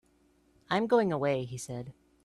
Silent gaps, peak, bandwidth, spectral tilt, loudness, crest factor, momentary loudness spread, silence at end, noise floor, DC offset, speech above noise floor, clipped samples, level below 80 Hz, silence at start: none; -14 dBFS; 13 kHz; -5.5 dB/octave; -30 LUFS; 18 dB; 15 LU; 0.35 s; -67 dBFS; under 0.1%; 38 dB; under 0.1%; -68 dBFS; 0.7 s